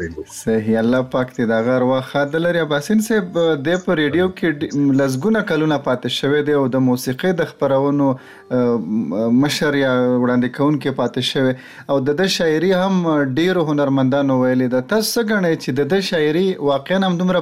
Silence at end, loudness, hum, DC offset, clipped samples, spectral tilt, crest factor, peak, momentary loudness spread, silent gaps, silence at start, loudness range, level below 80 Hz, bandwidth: 0 s; -18 LUFS; none; 0.1%; under 0.1%; -6 dB/octave; 10 dB; -8 dBFS; 4 LU; none; 0 s; 1 LU; -54 dBFS; 16 kHz